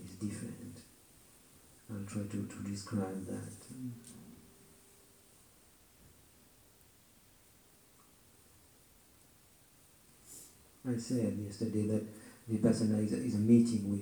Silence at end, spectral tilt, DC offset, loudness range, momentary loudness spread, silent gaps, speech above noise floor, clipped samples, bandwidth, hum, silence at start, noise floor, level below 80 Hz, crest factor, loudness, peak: 0 s; -7 dB/octave; under 0.1%; 26 LU; 24 LU; none; 30 dB; under 0.1%; over 20 kHz; none; 0 s; -64 dBFS; -72 dBFS; 24 dB; -35 LUFS; -14 dBFS